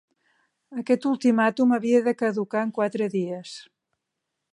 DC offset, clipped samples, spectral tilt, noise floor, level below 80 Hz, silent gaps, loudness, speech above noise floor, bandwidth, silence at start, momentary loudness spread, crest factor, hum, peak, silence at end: under 0.1%; under 0.1%; -6.5 dB/octave; -82 dBFS; -78 dBFS; none; -23 LUFS; 59 dB; 10.5 kHz; 0.7 s; 15 LU; 18 dB; none; -8 dBFS; 0.9 s